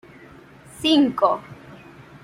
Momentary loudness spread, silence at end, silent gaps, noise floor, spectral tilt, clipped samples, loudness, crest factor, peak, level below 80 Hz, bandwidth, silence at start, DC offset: 25 LU; 0.5 s; none; -46 dBFS; -4.5 dB/octave; under 0.1%; -20 LUFS; 20 dB; -4 dBFS; -60 dBFS; 14.5 kHz; 0.8 s; under 0.1%